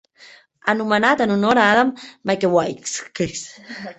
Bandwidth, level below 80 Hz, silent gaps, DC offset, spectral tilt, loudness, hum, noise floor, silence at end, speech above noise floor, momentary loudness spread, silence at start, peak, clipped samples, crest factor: 8.4 kHz; -56 dBFS; none; under 0.1%; -4 dB/octave; -19 LUFS; none; -48 dBFS; 0.05 s; 29 dB; 14 LU; 0.65 s; -2 dBFS; under 0.1%; 18 dB